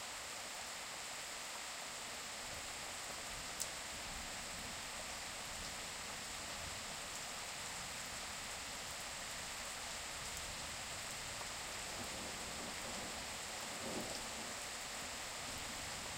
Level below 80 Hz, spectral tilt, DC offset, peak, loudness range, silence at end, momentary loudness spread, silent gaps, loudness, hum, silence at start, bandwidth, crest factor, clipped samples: -62 dBFS; -1 dB/octave; under 0.1%; -20 dBFS; 1 LU; 0 s; 2 LU; none; -44 LUFS; none; 0 s; 16 kHz; 26 dB; under 0.1%